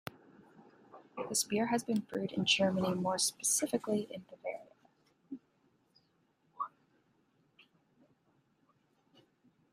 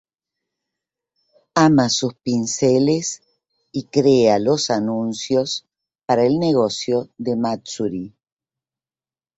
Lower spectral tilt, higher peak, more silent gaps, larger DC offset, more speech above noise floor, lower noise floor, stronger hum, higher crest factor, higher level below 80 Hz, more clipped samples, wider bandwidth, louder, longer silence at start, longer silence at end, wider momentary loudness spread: second, -3 dB/octave vs -5 dB/octave; second, -16 dBFS vs -2 dBFS; neither; neither; second, 40 dB vs over 72 dB; second, -74 dBFS vs under -90 dBFS; neither; about the same, 22 dB vs 18 dB; second, -78 dBFS vs -58 dBFS; neither; first, 15.5 kHz vs 8.2 kHz; second, -34 LUFS vs -19 LUFS; second, 0.05 s vs 1.55 s; first, 3.05 s vs 1.3 s; first, 21 LU vs 13 LU